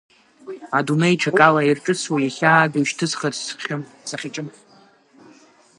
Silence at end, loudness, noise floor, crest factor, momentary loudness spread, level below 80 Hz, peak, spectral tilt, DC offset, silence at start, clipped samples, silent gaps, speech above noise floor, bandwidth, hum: 1.3 s; -19 LUFS; -53 dBFS; 22 dB; 16 LU; -70 dBFS; 0 dBFS; -4.5 dB/octave; under 0.1%; 0.45 s; under 0.1%; none; 33 dB; 11.5 kHz; none